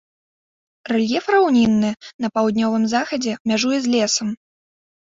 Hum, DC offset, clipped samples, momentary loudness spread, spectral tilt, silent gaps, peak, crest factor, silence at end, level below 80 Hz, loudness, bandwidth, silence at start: none; under 0.1%; under 0.1%; 9 LU; -4 dB/octave; 2.14-2.19 s, 3.40-3.45 s; -4 dBFS; 16 dB; 0.7 s; -58 dBFS; -19 LUFS; 7.8 kHz; 0.85 s